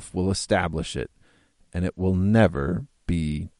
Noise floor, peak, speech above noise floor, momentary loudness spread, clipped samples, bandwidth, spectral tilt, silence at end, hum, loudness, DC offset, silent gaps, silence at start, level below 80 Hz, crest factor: -60 dBFS; -4 dBFS; 36 dB; 12 LU; under 0.1%; 11.5 kHz; -6 dB/octave; 0.1 s; none; -25 LUFS; under 0.1%; none; 0 s; -40 dBFS; 20 dB